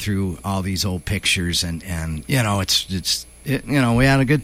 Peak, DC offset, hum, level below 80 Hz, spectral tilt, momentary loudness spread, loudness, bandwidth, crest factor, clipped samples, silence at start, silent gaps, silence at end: -4 dBFS; under 0.1%; none; -36 dBFS; -4.5 dB/octave; 10 LU; -20 LUFS; 16.5 kHz; 16 dB; under 0.1%; 0 s; none; 0 s